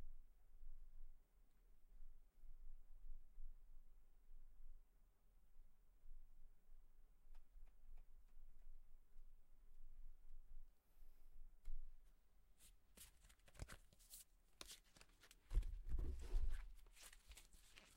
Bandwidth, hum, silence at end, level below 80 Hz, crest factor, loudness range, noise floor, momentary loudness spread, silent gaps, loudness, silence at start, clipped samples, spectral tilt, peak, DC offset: 16 kHz; none; 0 s; -54 dBFS; 22 dB; 14 LU; -72 dBFS; 18 LU; none; -58 LUFS; 0 s; under 0.1%; -4 dB/octave; -30 dBFS; under 0.1%